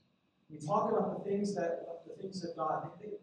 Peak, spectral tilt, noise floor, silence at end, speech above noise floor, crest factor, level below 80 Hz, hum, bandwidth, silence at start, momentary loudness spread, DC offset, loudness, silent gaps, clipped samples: -18 dBFS; -6.5 dB/octave; -73 dBFS; 0.05 s; 38 dB; 18 dB; -78 dBFS; none; 10.5 kHz; 0.5 s; 13 LU; under 0.1%; -36 LUFS; none; under 0.1%